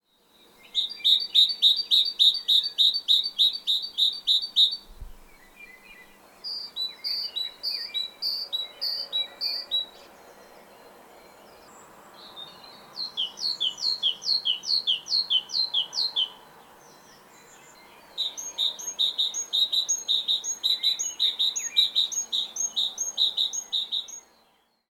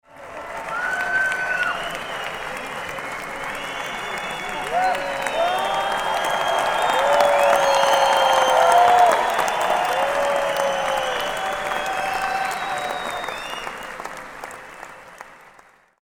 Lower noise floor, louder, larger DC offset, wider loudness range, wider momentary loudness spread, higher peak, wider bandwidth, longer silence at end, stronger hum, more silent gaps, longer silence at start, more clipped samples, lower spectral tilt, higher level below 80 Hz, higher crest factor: first, -65 dBFS vs -52 dBFS; about the same, -23 LUFS vs -21 LUFS; neither; about the same, 12 LU vs 10 LU; second, 12 LU vs 17 LU; second, -6 dBFS vs -2 dBFS; about the same, 19 kHz vs 18 kHz; about the same, 0.7 s vs 0.65 s; neither; neither; first, 0.75 s vs 0.15 s; neither; second, 2.5 dB/octave vs -1.5 dB/octave; second, -60 dBFS vs -52 dBFS; about the same, 22 dB vs 20 dB